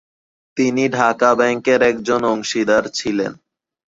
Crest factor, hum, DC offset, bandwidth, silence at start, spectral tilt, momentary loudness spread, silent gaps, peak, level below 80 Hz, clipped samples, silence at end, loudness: 16 dB; none; under 0.1%; 7.8 kHz; 0.55 s; -4 dB/octave; 7 LU; none; -2 dBFS; -56 dBFS; under 0.1%; 0.55 s; -17 LUFS